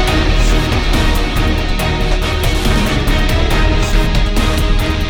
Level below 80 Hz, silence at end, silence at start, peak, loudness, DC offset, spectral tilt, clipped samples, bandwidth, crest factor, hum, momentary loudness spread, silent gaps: -14 dBFS; 0 s; 0 s; -2 dBFS; -15 LUFS; under 0.1%; -5 dB/octave; under 0.1%; 17 kHz; 12 dB; none; 2 LU; none